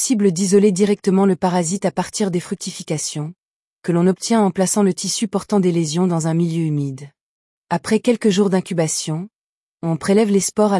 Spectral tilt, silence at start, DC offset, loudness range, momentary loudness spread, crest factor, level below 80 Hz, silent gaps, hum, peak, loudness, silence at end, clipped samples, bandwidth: -5.5 dB/octave; 0 s; under 0.1%; 3 LU; 11 LU; 14 dB; -62 dBFS; 3.45-3.77 s, 7.21-7.62 s, 9.36-9.78 s; none; -4 dBFS; -18 LUFS; 0 s; under 0.1%; 12 kHz